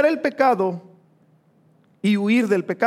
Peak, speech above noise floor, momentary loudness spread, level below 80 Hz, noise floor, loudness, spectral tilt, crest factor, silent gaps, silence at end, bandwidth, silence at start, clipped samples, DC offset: -4 dBFS; 39 dB; 7 LU; -80 dBFS; -58 dBFS; -20 LUFS; -6.5 dB/octave; 16 dB; none; 0 s; 13.5 kHz; 0 s; under 0.1%; under 0.1%